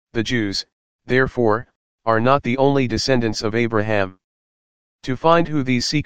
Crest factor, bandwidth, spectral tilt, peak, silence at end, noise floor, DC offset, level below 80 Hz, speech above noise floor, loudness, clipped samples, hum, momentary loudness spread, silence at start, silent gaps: 20 dB; 15 kHz; -5.5 dB/octave; 0 dBFS; 0 s; under -90 dBFS; 2%; -46 dBFS; over 72 dB; -19 LUFS; under 0.1%; none; 10 LU; 0.05 s; 0.72-0.99 s, 1.76-1.98 s, 4.24-4.99 s